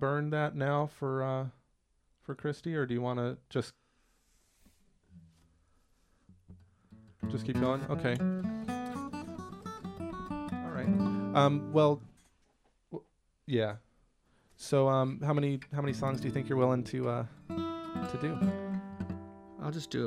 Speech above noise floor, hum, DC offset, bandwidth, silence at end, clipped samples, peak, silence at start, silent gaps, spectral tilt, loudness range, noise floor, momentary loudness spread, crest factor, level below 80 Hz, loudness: 42 dB; none; under 0.1%; 12.5 kHz; 0 s; under 0.1%; -12 dBFS; 0 s; none; -7.5 dB/octave; 7 LU; -73 dBFS; 16 LU; 22 dB; -62 dBFS; -33 LUFS